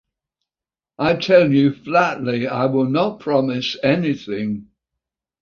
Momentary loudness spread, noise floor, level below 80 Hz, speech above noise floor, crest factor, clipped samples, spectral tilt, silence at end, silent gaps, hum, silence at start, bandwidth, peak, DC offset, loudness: 10 LU; under -90 dBFS; -56 dBFS; over 72 dB; 18 dB; under 0.1%; -7 dB/octave; 0.8 s; none; none; 1 s; 7 kHz; -2 dBFS; under 0.1%; -18 LUFS